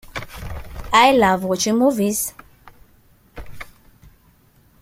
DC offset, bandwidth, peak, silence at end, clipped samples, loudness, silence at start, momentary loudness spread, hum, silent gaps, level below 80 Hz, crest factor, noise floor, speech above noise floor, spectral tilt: under 0.1%; 16.5 kHz; -2 dBFS; 1.2 s; under 0.1%; -17 LUFS; 0.05 s; 25 LU; none; none; -42 dBFS; 20 dB; -55 dBFS; 38 dB; -3.5 dB/octave